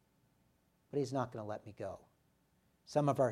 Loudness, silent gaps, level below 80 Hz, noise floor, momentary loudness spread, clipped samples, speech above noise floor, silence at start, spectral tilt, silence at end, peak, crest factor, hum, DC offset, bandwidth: -39 LUFS; none; -76 dBFS; -75 dBFS; 13 LU; under 0.1%; 38 dB; 0.95 s; -7 dB/octave; 0 s; -18 dBFS; 22 dB; none; under 0.1%; 13.5 kHz